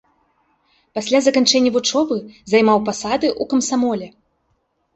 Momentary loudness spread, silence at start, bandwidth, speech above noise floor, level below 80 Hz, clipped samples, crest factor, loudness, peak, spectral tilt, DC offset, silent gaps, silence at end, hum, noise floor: 12 LU; 0.95 s; 8.4 kHz; 50 dB; -58 dBFS; under 0.1%; 18 dB; -17 LUFS; -2 dBFS; -3 dB/octave; under 0.1%; none; 0.85 s; none; -67 dBFS